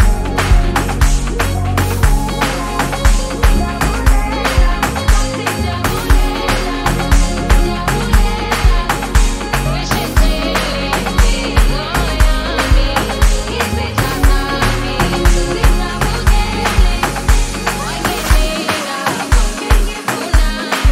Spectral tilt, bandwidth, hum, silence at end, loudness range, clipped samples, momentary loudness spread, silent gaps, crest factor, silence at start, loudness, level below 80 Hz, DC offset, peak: -4.5 dB/octave; 16 kHz; none; 0 s; 1 LU; under 0.1%; 3 LU; none; 12 dB; 0 s; -15 LUFS; -14 dBFS; under 0.1%; 0 dBFS